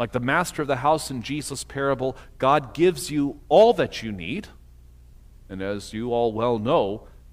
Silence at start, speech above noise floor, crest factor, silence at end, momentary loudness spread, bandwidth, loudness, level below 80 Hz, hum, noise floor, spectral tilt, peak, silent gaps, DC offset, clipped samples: 0 s; 25 dB; 18 dB; 0.3 s; 13 LU; 16 kHz; -23 LUFS; -48 dBFS; 60 Hz at -50 dBFS; -48 dBFS; -5 dB/octave; -6 dBFS; none; under 0.1%; under 0.1%